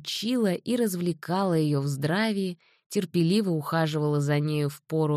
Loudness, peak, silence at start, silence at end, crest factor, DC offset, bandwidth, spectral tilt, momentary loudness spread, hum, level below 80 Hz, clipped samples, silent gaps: -27 LUFS; -12 dBFS; 0 s; 0 s; 14 dB; under 0.1%; 14.5 kHz; -6 dB/octave; 6 LU; none; -70 dBFS; under 0.1%; 2.86-2.90 s